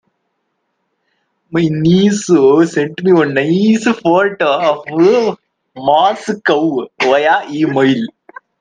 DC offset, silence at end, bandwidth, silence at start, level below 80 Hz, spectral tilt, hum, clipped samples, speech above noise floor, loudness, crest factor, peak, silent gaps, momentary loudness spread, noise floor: under 0.1%; 0.55 s; 9.6 kHz; 1.5 s; -56 dBFS; -6 dB/octave; none; under 0.1%; 56 dB; -13 LUFS; 14 dB; 0 dBFS; none; 7 LU; -68 dBFS